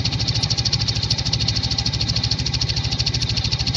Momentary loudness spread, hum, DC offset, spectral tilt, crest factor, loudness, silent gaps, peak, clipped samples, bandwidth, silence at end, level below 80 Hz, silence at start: 2 LU; none; under 0.1%; -3.5 dB/octave; 16 dB; -20 LUFS; none; -4 dBFS; under 0.1%; 10 kHz; 0 s; -32 dBFS; 0 s